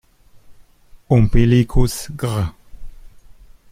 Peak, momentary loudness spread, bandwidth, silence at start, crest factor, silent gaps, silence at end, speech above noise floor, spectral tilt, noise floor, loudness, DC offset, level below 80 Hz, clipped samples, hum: -2 dBFS; 10 LU; 15.5 kHz; 0.5 s; 18 dB; none; 0.8 s; 31 dB; -7 dB/octave; -45 dBFS; -18 LUFS; under 0.1%; -26 dBFS; under 0.1%; none